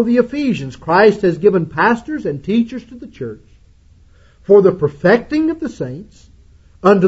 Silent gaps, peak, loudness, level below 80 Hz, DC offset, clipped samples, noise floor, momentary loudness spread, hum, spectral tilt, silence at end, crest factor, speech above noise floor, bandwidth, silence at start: none; 0 dBFS; -15 LUFS; -46 dBFS; under 0.1%; under 0.1%; -47 dBFS; 18 LU; none; -7.5 dB/octave; 0 s; 16 dB; 32 dB; 8 kHz; 0 s